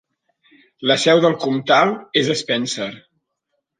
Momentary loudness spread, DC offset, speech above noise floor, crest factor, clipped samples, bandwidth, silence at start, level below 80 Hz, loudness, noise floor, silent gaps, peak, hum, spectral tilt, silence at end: 10 LU; under 0.1%; 57 dB; 18 dB; under 0.1%; 9.8 kHz; 0.8 s; -68 dBFS; -17 LUFS; -75 dBFS; none; -2 dBFS; none; -4 dB/octave; 0.8 s